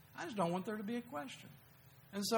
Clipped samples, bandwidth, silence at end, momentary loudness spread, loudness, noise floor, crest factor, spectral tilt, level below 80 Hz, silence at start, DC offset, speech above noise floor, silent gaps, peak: under 0.1%; over 20 kHz; 0 s; 23 LU; -42 LUFS; -62 dBFS; 20 dB; -4.5 dB/octave; -80 dBFS; 0.05 s; under 0.1%; 20 dB; none; -22 dBFS